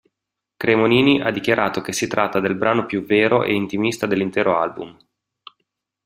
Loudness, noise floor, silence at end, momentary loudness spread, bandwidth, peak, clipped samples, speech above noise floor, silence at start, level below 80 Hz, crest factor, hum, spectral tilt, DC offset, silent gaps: -19 LUFS; -83 dBFS; 1.15 s; 8 LU; 16 kHz; -2 dBFS; under 0.1%; 64 dB; 0.6 s; -58 dBFS; 18 dB; none; -5 dB/octave; under 0.1%; none